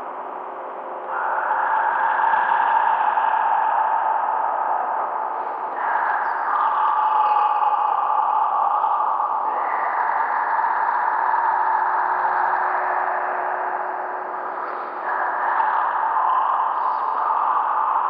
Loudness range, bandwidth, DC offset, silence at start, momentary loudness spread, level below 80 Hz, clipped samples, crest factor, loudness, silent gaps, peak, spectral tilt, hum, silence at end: 3 LU; 5 kHz; under 0.1%; 0 s; 8 LU; under -90 dBFS; under 0.1%; 14 dB; -21 LUFS; none; -6 dBFS; -5 dB/octave; none; 0 s